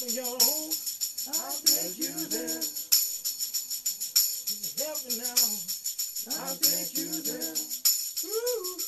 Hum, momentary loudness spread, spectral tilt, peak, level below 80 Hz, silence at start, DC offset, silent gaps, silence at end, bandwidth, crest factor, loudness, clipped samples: none; 7 LU; 0.5 dB/octave; -4 dBFS; -76 dBFS; 0 s; under 0.1%; none; 0 s; 16 kHz; 26 dB; -27 LUFS; under 0.1%